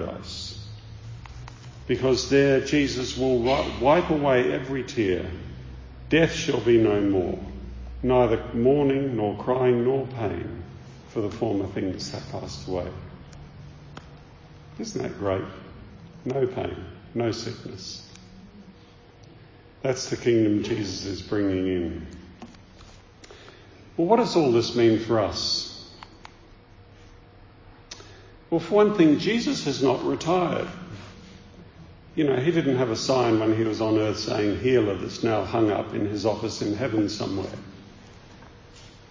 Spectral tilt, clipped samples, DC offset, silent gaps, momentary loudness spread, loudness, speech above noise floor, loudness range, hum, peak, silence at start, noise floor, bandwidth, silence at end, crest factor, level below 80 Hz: -6 dB/octave; under 0.1%; under 0.1%; none; 22 LU; -24 LUFS; 27 dB; 9 LU; none; -6 dBFS; 0 s; -50 dBFS; 7.6 kHz; 0.15 s; 20 dB; -46 dBFS